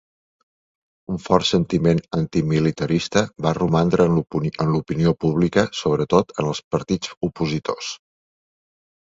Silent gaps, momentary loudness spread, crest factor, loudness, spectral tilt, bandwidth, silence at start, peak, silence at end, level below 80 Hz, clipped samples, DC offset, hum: 6.64-6.71 s, 7.17-7.21 s; 8 LU; 20 dB; -21 LUFS; -6.5 dB/octave; 7.8 kHz; 1.1 s; 0 dBFS; 1.15 s; -46 dBFS; under 0.1%; under 0.1%; none